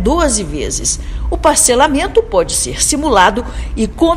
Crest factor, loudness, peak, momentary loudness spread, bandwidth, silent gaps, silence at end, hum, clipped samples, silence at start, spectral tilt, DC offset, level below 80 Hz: 14 dB; -13 LUFS; 0 dBFS; 10 LU; over 20 kHz; none; 0 s; none; 0.4%; 0 s; -3 dB/octave; under 0.1%; -24 dBFS